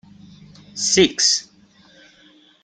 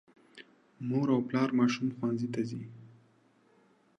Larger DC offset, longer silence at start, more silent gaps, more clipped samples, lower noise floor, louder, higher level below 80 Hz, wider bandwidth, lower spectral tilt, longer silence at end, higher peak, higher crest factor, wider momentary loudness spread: neither; first, 0.75 s vs 0.35 s; neither; neither; second, -52 dBFS vs -66 dBFS; first, -17 LUFS vs -31 LUFS; first, -58 dBFS vs -78 dBFS; first, 10.5 kHz vs 7.6 kHz; second, -2 dB/octave vs -7 dB/octave; about the same, 1.2 s vs 1.1 s; first, -2 dBFS vs -14 dBFS; about the same, 20 dB vs 18 dB; second, 10 LU vs 14 LU